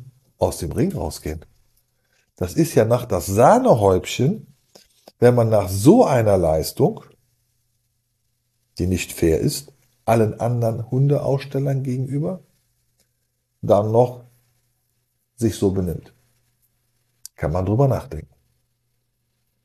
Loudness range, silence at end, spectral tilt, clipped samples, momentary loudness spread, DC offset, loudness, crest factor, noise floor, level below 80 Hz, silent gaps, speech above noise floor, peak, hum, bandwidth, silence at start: 9 LU; 1.45 s; -7 dB/octave; under 0.1%; 15 LU; under 0.1%; -19 LUFS; 20 dB; -71 dBFS; -44 dBFS; none; 53 dB; -2 dBFS; none; 13 kHz; 0 s